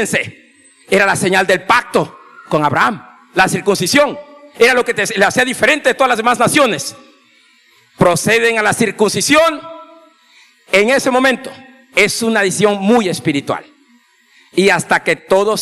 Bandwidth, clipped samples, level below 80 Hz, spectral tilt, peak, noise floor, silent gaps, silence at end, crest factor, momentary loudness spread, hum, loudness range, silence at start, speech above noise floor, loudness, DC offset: 15.5 kHz; under 0.1%; -52 dBFS; -3.5 dB/octave; 0 dBFS; -52 dBFS; none; 0 s; 14 dB; 10 LU; none; 2 LU; 0 s; 38 dB; -13 LUFS; under 0.1%